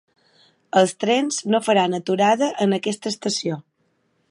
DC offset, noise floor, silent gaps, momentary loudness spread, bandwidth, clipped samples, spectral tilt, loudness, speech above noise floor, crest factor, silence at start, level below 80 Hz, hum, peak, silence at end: under 0.1%; -67 dBFS; none; 7 LU; 11.5 kHz; under 0.1%; -4 dB/octave; -20 LUFS; 47 dB; 18 dB; 0.75 s; -74 dBFS; none; -4 dBFS; 0.7 s